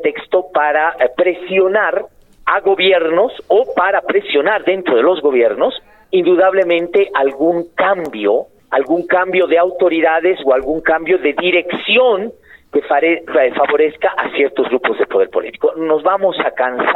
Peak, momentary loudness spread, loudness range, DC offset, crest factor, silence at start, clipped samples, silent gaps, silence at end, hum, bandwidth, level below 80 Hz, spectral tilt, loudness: -2 dBFS; 6 LU; 2 LU; 0.2%; 12 dB; 0 s; under 0.1%; none; 0 s; none; 4.1 kHz; -52 dBFS; -6.5 dB/octave; -14 LUFS